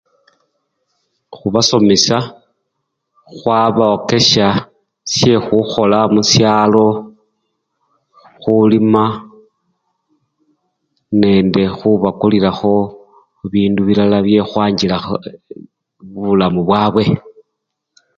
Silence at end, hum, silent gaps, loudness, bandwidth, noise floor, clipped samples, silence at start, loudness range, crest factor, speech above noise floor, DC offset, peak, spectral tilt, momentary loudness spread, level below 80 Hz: 0.85 s; none; none; -13 LUFS; 7.6 kHz; -75 dBFS; under 0.1%; 1.3 s; 5 LU; 14 dB; 62 dB; under 0.1%; 0 dBFS; -5 dB/octave; 13 LU; -46 dBFS